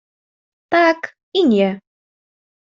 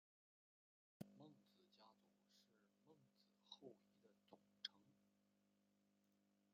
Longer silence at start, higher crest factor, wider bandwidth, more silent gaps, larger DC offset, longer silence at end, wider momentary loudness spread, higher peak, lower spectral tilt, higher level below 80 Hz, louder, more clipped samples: second, 0.7 s vs 1 s; second, 16 dB vs 36 dB; about the same, 7.4 kHz vs 7 kHz; first, 1.23-1.32 s vs none; neither; first, 0.85 s vs 0 s; second, 9 LU vs 12 LU; first, -2 dBFS vs -32 dBFS; first, -6.5 dB/octave vs -2.5 dB/octave; first, -64 dBFS vs under -90 dBFS; first, -17 LUFS vs -61 LUFS; neither